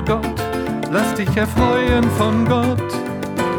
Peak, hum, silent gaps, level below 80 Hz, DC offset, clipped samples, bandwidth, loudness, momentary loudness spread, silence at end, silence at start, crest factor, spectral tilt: -2 dBFS; none; none; -32 dBFS; under 0.1%; under 0.1%; over 20 kHz; -18 LUFS; 7 LU; 0 s; 0 s; 16 dB; -6.5 dB/octave